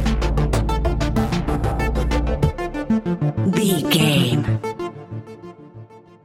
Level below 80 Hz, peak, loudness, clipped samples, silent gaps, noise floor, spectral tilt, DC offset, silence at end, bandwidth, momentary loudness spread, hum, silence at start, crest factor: -26 dBFS; -4 dBFS; -20 LUFS; under 0.1%; none; -42 dBFS; -6 dB/octave; under 0.1%; 0.25 s; 16 kHz; 18 LU; none; 0 s; 16 dB